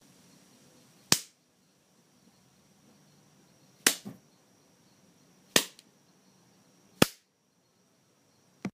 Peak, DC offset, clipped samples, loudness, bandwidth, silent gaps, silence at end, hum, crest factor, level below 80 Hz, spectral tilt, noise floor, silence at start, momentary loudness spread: 0 dBFS; under 0.1%; under 0.1%; -28 LUFS; 15.5 kHz; none; 0.05 s; none; 36 dB; -66 dBFS; -2 dB/octave; -71 dBFS; 1.1 s; 16 LU